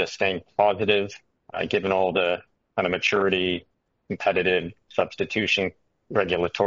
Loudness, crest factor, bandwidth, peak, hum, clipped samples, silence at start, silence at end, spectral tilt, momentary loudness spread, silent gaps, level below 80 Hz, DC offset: -24 LUFS; 20 dB; 7.6 kHz; -6 dBFS; none; under 0.1%; 0 s; 0 s; -2.5 dB/octave; 10 LU; none; -60 dBFS; under 0.1%